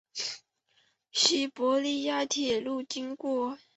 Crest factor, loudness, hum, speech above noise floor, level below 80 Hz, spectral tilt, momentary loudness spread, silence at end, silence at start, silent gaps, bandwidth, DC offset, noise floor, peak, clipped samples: 20 dB; -29 LUFS; none; 41 dB; -72 dBFS; -1 dB/octave; 11 LU; 0.2 s; 0.15 s; none; 8.2 kHz; under 0.1%; -71 dBFS; -10 dBFS; under 0.1%